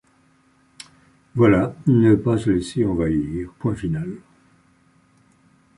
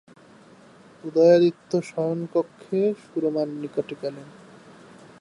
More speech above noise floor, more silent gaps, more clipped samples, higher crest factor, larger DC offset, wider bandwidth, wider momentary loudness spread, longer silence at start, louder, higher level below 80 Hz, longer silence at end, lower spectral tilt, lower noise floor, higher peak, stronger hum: first, 40 dB vs 28 dB; neither; neither; about the same, 18 dB vs 18 dB; neither; about the same, 11.5 kHz vs 11 kHz; second, 12 LU vs 16 LU; first, 1.35 s vs 1.05 s; first, -20 LUFS vs -24 LUFS; first, -44 dBFS vs -76 dBFS; first, 1.6 s vs 0.9 s; about the same, -8 dB/octave vs -7.5 dB/octave; first, -59 dBFS vs -51 dBFS; about the same, -4 dBFS vs -6 dBFS; neither